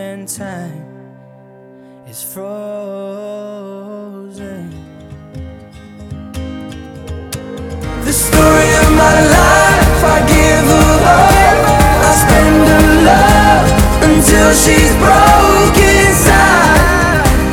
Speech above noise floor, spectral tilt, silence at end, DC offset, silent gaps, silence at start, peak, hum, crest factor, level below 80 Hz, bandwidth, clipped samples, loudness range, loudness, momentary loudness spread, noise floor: 26 dB; -4.5 dB/octave; 0 s; under 0.1%; none; 0 s; 0 dBFS; none; 10 dB; -18 dBFS; 18.5 kHz; 0.3%; 20 LU; -8 LUFS; 21 LU; -39 dBFS